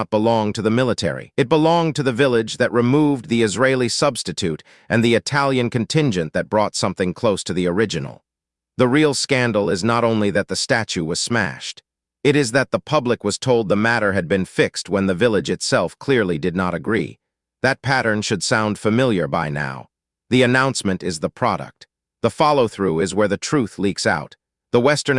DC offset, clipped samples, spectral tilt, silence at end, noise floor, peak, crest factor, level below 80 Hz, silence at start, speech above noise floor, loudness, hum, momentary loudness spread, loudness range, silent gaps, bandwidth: under 0.1%; under 0.1%; -5 dB/octave; 0 s; -86 dBFS; -2 dBFS; 18 dB; -54 dBFS; 0 s; 67 dB; -19 LUFS; none; 7 LU; 2 LU; none; 12 kHz